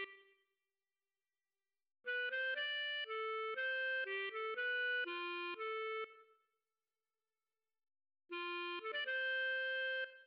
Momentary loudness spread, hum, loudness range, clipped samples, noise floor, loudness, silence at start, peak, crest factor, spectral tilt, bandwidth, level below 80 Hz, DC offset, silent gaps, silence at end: 6 LU; none; 9 LU; under 0.1%; under -90 dBFS; -40 LUFS; 0 s; -32 dBFS; 10 dB; 5 dB/octave; 5.6 kHz; under -90 dBFS; under 0.1%; none; 0 s